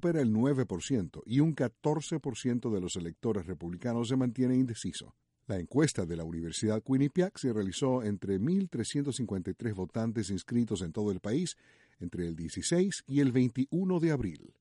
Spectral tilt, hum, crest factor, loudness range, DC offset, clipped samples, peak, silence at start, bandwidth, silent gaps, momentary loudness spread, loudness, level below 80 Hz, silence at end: -6 dB/octave; none; 16 dB; 2 LU; under 0.1%; under 0.1%; -14 dBFS; 0 s; 11.5 kHz; none; 9 LU; -32 LUFS; -58 dBFS; 0.15 s